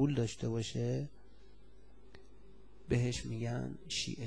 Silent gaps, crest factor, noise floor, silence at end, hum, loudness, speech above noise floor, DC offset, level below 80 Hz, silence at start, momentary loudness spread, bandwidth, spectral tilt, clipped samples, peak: none; 16 dB; -61 dBFS; 0 s; none; -37 LUFS; 25 dB; 0.3%; -56 dBFS; 0 s; 7 LU; 10.5 kHz; -5.5 dB/octave; under 0.1%; -22 dBFS